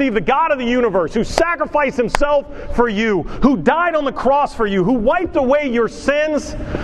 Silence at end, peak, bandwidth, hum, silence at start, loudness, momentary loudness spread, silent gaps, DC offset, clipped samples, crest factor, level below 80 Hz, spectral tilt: 0 s; 0 dBFS; 12 kHz; none; 0 s; -17 LUFS; 3 LU; none; under 0.1%; under 0.1%; 16 dB; -32 dBFS; -5.5 dB/octave